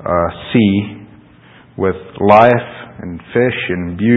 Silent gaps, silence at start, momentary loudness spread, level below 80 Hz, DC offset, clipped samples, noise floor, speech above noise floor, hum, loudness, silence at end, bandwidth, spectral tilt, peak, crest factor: none; 0 s; 20 LU; -40 dBFS; under 0.1%; 0.1%; -43 dBFS; 30 dB; none; -14 LUFS; 0 s; 6.2 kHz; -9 dB/octave; 0 dBFS; 14 dB